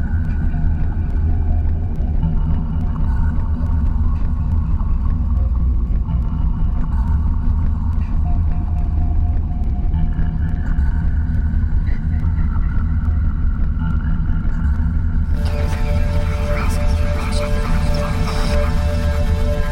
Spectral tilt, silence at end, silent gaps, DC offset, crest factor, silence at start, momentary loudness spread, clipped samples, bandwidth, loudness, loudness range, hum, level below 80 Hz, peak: -7.5 dB/octave; 0 s; none; 1%; 12 dB; 0 s; 2 LU; under 0.1%; 10.5 kHz; -20 LUFS; 1 LU; none; -18 dBFS; -4 dBFS